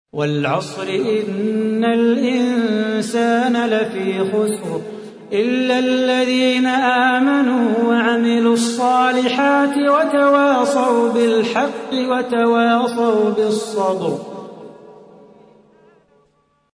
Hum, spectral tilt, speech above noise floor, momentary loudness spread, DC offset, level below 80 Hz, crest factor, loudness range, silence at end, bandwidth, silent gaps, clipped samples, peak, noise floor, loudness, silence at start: none; -5 dB/octave; 45 dB; 7 LU; under 0.1%; -68 dBFS; 14 dB; 4 LU; 1.75 s; 11 kHz; none; under 0.1%; -2 dBFS; -61 dBFS; -17 LUFS; 0.15 s